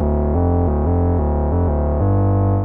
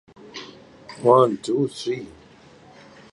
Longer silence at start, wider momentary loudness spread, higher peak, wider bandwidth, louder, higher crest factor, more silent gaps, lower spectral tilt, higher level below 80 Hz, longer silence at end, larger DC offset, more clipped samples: second, 0 s vs 0.35 s; second, 2 LU vs 26 LU; second, -6 dBFS vs -2 dBFS; second, 2.5 kHz vs 11.5 kHz; first, -18 LUFS vs -21 LUFS; second, 10 dB vs 22 dB; neither; first, -15 dB/octave vs -6.5 dB/octave; first, -22 dBFS vs -64 dBFS; second, 0 s vs 1.05 s; neither; neither